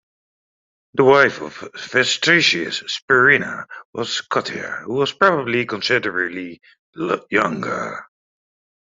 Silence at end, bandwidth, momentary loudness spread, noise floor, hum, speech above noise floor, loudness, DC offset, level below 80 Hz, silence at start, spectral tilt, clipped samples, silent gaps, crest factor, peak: 0.8 s; 7.8 kHz; 18 LU; under -90 dBFS; none; over 71 dB; -18 LUFS; under 0.1%; -62 dBFS; 0.95 s; -3.5 dB/octave; under 0.1%; 3.02-3.08 s, 3.85-3.93 s, 6.79-6.93 s; 18 dB; -2 dBFS